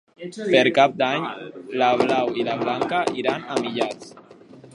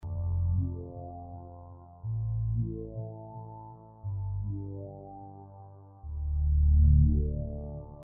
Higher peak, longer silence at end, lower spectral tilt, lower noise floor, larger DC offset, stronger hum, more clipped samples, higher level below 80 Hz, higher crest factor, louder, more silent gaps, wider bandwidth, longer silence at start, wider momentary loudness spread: first, 0 dBFS vs -12 dBFS; about the same, 0.05 s vs 0 s; second, -5 dB/octave vs -15.5 dB/octave; second, -46 dBFS vs -50 dBFS; neither; neither; neither; second, -66 dBFS vs -32 dBFS; about the same, 22 dB vs 18 dB; first, -22 LUFS vs -30 LUFS; neither; first, 11.5 kHz vs 1.2 kHz; first, 0.2 s vs 0 s; second, 14 LU vs 24 LU